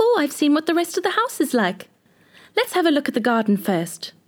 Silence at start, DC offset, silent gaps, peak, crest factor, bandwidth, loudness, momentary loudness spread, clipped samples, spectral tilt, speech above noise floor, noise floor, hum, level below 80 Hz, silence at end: 0 s; under 0.1%; none; -6 dBFS; 14 dB; 19.5 kHz; -21 LUFS; 6 LU; under 0.1%; -4.5 dB/octave; 33 dB; -53 dBFS; none; -78 dBFS; 0.2 s